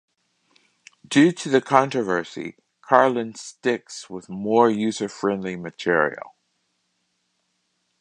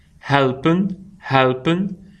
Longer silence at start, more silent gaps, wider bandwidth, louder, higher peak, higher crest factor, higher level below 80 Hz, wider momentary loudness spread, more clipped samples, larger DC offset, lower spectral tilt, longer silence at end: first, 1.1 s vs 0.25 s; neither; first, 10.5 kHz vs 9 kHz; about the same, -21 LUFS vs -19 LUFS; about the same, 0 dBFS vs 0 dBFS; about the same, 22 dB vs 18 dB; second, -68 dBFS vs -52 dBFS; first, 17 LU vs 9 LU; neither; neither; second, -5 dB/octave vs -7.5 dB/octave; first, 1.75 s vs 0.25 s